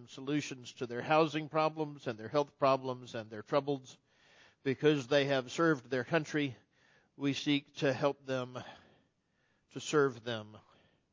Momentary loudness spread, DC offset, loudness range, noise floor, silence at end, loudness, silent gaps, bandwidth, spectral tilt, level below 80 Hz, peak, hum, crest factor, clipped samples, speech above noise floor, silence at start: 13 LU; under 0.1%; 4 LU; -76 dBFS; 0.55 s; -34 LUFS; none; 7.6 kHz; -5.5 dB/octave; -78 dBFS; -14 dBFS; none; 20 dB; under 0.1%; 43 dB; 0 s